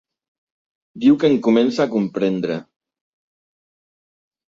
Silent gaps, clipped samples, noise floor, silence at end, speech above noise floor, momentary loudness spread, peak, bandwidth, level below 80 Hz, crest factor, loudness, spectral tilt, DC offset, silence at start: none; under 0.1%; under -90 dBFS; 1.95 s; over 73 dB; 9 LU; -4 dBFS; 7.6 kHz; -64 dBFS; 18 dB; -18 LUFS; -7 dB/octave; under 0.1%; 0.95 s